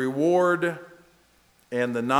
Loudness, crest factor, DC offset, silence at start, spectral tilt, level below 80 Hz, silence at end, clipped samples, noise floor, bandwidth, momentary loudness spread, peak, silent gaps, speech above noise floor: -24 LUFS; 20 dB; under 0.1%; 0 s; -6 dB/octave; -72 dBFS; 0 s; under 0.1%; -61 dBFS; 13.5 kHz; 11 LU; -6 dBFS; none; 38 dB